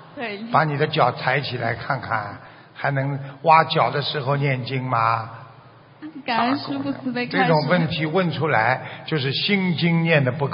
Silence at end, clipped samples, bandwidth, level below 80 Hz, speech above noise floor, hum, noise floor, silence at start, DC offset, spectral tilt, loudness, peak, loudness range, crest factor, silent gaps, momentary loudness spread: 0 s; under 0.1%; 5.6 kHz; -62 dBFS; 26 dB; none; -47 dBFS; 0 s; under 0.1%; -4 dB/octave; -21 LUFS; 0 dBFS; 3 LU; 22 dB; none; 10 LU